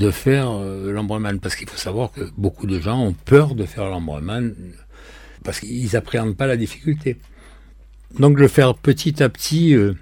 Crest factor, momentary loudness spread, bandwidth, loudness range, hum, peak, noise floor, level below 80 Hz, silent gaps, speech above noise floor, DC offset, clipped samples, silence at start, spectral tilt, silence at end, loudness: 18 dB; 12 LU; 17.5 kHz; 6 LU; none; 0 dBFS; -44 dBFS; -40 dBFS; none; 25 dB; under 0.1%; under 0.1%; 0 s; -6.5 dB/octave; 0.05 s; -19 LUFS